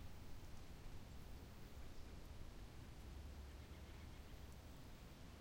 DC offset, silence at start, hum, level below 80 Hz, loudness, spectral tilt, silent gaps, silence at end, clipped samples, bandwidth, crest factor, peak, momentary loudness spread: under 0.1%; 0 s; none; -58 dBFS; -59 LUFS; -5.5 dB/octave; none; 0 s; under 0.1%; 16.5 kHz; 12 dB; -42 dBFS; 2 LU